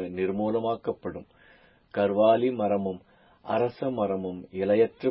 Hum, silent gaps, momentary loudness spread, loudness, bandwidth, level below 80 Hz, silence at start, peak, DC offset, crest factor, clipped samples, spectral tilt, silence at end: none; none; 14 LU; -27 LUFS; 5.6 kHz; -60 dBFS; 0 s; -10 dBFS; under 0.1%; 18 dB; under 0.1%; -11 dB/octave; 0 s